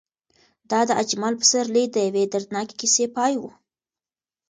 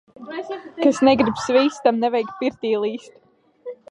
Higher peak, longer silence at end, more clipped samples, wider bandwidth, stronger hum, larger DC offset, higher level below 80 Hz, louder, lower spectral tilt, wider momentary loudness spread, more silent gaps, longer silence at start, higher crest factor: about the same, -4 dBFS vs -2 dBFS; first, 1 s vs 0.15 s; neither; about the same, 10 kHz vs 11 kHz; neither; neither; second, -72 dBFS vs -58 dBFS; about the same, -21 LUFS vs -20 LUFS; second, -2 dB/octave vs -5 dB/octave; second, 9 LU vs 19 LU; neither; first, 0.7 s vs 0.2 s; about the same, 20 dB vs 18 dB